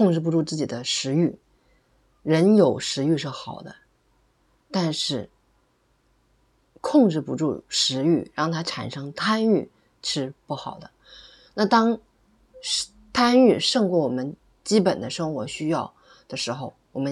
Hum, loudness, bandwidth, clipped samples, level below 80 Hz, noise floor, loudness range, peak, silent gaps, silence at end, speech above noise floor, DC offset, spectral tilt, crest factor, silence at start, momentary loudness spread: none; -23 LUFS; 12.5 kHz; under 0.1%; -64 dBFS; -66 dBFS; 6 LU; -6 dBFS; none; 0 s; 43 dB; under 0.1%; -5 dB/octave; 18 dB; 0 s; 16 LU